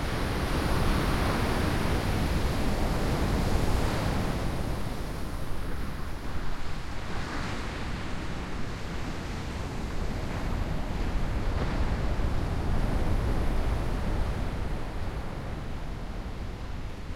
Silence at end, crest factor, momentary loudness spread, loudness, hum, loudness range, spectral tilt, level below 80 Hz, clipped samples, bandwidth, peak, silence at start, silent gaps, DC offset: 0 s; 16 dB; 10 LU; -32 LUFS; none; 7 LU; -6 dB/octave; -32 dBFS; under 0.1%; 16.5 kHz; -14 dBFS; 0 s; none; under 0.1%